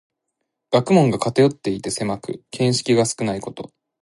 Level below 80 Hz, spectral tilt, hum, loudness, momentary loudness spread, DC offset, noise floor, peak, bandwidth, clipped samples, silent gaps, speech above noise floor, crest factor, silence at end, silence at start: -56 dBFS; -5.5 dB/octave; none; -20 LUFS; 15 LU; under 0.1%; -78 dBFS; -2 dBFS; 11.5 kHz; under 0.1%; none; 58 dB; 18 dB; 0.35 s; 0.7 s